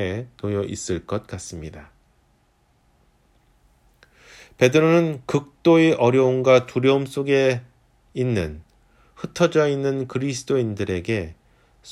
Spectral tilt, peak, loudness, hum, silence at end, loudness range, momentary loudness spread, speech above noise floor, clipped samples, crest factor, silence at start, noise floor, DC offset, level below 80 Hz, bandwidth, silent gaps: -6 dB/octave; -4 dBFS; -21 LUFS; none; 0 s; 13 LU; 17 LU; 42 dB; under 0.1%; 20 dB; 0 s; -62 dBFS; under 0.1%; -52 dBFS; 13.5 kHz; none